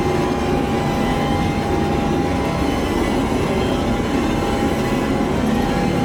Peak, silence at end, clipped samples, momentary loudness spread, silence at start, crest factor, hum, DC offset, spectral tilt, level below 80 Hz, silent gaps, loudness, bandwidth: -6 dBFS; 0 s; under 0.1%; 1 LU; 0 s; 12 dB; none; under 0.1%; -6 dB/octave; -30 dBFS; none; -19 LUFS; over 20 kHz